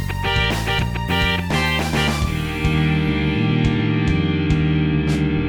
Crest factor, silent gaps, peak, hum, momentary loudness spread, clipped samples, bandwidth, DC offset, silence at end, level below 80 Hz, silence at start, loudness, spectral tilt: 14 dB; none; -4 dBFS; none; 3 LU; under 0.1%; 19.5 kHz; under 0.1%; 0 s; -28 dBFS; 0 s; -19 LUFS; -6 dB/octave